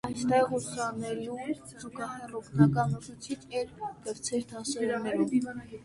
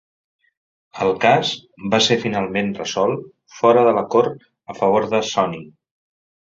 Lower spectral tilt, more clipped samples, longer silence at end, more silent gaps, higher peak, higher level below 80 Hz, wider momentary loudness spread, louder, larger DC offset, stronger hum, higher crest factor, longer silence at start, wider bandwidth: first, -6 dB/octave vs -4.5 dB/octave; neither; second, 0 s vs 0.8 s; neither; second, -8 dBFS vs -2 dBFS; about the same, -60 dBFS vs -58 dBFS; first, 14 LU vs 10 LU; second, -31 LUFS vs -18 LUFS; neither; neither; about the same, 22 dB vs 18 dB; second, 0.05 s vs 0.95 s; first, 11.5 kHz vs 7.8 kHz